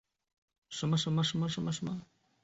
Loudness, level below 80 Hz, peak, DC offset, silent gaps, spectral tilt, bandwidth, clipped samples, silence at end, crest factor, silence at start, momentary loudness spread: -33 LUFS; -68 dBFS; -20 dBFS; under 0.1%; none; -5 dB/octave; 8 kHz; under 0.1%; 0.4 s; 16 dB; 0.7 s; 12 LU